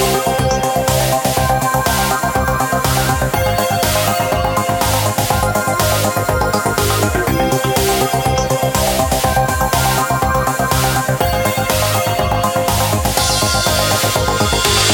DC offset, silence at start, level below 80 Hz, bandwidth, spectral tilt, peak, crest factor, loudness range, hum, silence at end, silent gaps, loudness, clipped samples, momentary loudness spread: under 0.1%; 0 s; -28 dBFS; 17.5 kHz; -3.5 dB/octave; 0 dBFS; 14 dB; 1 LU; none; 0 s; none; -15 LUFS; under 0.1%; 2 LU